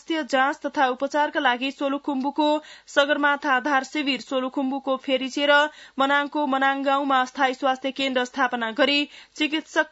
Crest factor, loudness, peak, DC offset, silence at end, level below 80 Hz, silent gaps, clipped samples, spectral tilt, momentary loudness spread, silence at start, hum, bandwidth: 18 dB; -23 LUFS; -6 dBFS; under 0.1%; 0.05 s; -72 dBFS; none; under 0.1%; -2 dB/octave; 6 LU; 0.1 s; none; 8 kHz